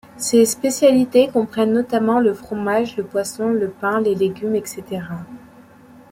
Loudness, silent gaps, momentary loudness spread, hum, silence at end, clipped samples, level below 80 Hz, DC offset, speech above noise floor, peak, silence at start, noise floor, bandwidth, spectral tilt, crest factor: -18 LUFS; none; 13 LU; none; 0.75 s; under 0.1%; -58 dBFS; under 0.1%; 27 dB; -2 dBFS; 0.15 s; -45 dBFS; 16.5 kHz; -4.5 dB/octave; 16 dB